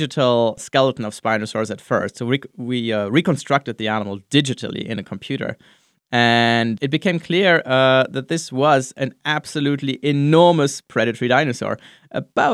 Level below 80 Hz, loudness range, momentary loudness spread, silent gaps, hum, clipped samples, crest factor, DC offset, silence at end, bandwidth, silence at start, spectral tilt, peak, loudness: -64 dBFS; 4 LU; 11 LU; none; none; under 0.1%; 18 dB; under 0.1%; 0 s; 12.5 kHz; 0 s; -5 dB/octave; -2 dBFS; -19 LUFS